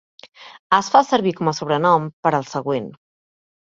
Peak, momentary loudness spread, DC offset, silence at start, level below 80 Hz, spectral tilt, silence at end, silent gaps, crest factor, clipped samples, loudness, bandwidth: 0 dBFS; 9 LU; under 0.1%; 0.4 s; -64 dBFS; -5 dB/octave; 0.7 s; 0.59-0.70 s, 2.13-2.23 s; 20 dB; under 0.1%; -19 LUFS; 7.8 kHz